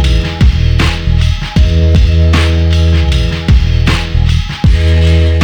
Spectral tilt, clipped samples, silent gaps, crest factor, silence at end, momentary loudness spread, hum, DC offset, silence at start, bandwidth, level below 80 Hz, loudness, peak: -6.5 dB/octave; under 0.1%; none; 8 dB; 0 s; 4 LU; none; under 0.1%; 0 s; 9.8 kHz; -12 dBFS; -11 LUFS; 0 dBFS